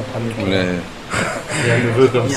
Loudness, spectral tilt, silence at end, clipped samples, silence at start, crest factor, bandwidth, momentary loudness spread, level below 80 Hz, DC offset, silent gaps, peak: -18 LUFS; -5.5 dB/octave; 0 s; under 0.1%; 0 s; 18 dB; 14.5 kHz; 9 LU; -42 dBFS; 0.6%; none; 0 dBFS